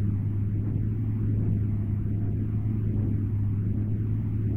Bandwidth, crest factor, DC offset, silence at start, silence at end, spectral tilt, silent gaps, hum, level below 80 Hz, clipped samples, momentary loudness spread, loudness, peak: 2.6 kHz; 10 dB; 0.5%; 0 s; 0 s; -12.5 dB/octave; none; none; -38 dBFS; under 0.1%; 2 LU; -28 LUFS; -16 dBFS